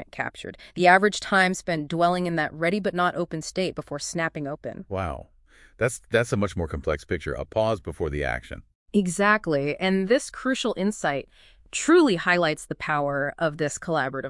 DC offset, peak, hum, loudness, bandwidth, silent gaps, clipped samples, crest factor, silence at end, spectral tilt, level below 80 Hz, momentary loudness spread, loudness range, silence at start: under 0.1%; -4 dBFS; none; -25 LUFS; 12 kHz; 8.75-8.86 s; under 0.1%; 20 dB; 0 s; -5 dB/octave; -48 dBFS; 12 LU; 6 LU; 0 s